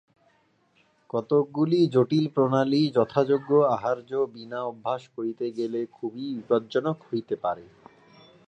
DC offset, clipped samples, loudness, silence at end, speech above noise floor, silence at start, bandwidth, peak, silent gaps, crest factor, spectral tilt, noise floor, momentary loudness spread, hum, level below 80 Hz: under 0.1%; under 0.1%; -26 LUFS; 0.85 s; 41 dB; 1.15 s; 8.6 kHz; -8 dBFS; none; 20 dB; -8 dB/octave; -66 dBFS; 11 LU; none; -72 dBFS